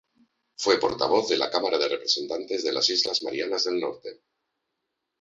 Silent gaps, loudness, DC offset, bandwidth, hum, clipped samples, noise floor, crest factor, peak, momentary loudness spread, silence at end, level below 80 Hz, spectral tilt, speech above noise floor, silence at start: none; -25 LUFS; under 0.1%; 7.8 kHz; none; under 0.1%; -81 dBFS; 20 dB; -6 dBFS; 8 LU; 1.1 s; -66 dBFS; -2 dB/octave; 56 dB; 0.6 s